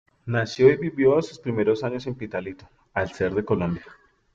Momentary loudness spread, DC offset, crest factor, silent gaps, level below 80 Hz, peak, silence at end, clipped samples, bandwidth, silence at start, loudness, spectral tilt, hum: 13 LU; under 0.1%; 20 dB; none; -56 dBFS; -4 dBFS; 0.4 s; under 0.1%; 7.6 kHz; 0.25 s; -24 LUFS; -7 dB/octave; none